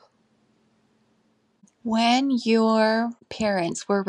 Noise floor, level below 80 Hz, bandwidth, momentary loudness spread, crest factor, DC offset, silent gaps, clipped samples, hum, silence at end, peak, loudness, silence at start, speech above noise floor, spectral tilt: -66 dBFS; -66 dBFS; 10.5 kHz; 8 LU; 18 dB; under 0.1%; none; under 0.1%; none; 0 s; -8 dBFS; -22 LUFS; 1.85 s; 44 dB; -4.5 dB/octave